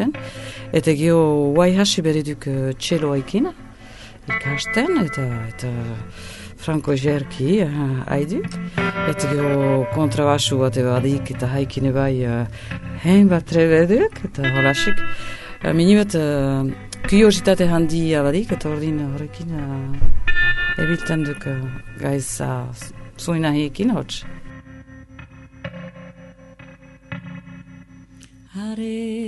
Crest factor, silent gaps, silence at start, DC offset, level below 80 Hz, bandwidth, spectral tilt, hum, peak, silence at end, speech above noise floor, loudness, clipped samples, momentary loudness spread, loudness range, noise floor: 18 dB; none; 0 s; under 0.1%; -32 dBFS; 11.5 kHz; -6 dB/octave; none; -2 dBFS; 0 s; 27 dB; -20 LUFS; under 0.1%; 18 LU; 11 LU; -46 dBFS